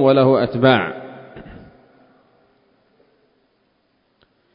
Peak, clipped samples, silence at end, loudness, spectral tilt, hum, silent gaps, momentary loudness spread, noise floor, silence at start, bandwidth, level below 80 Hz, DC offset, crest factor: 0 dBFS; under 0.1%; 3.15 s; -16 LUFS; -10 dB/octave; none; none; 26 LU; -64 dBFS; 0 s; 5.2 kHz; -56 dBFS; under 0.1%; 22 dB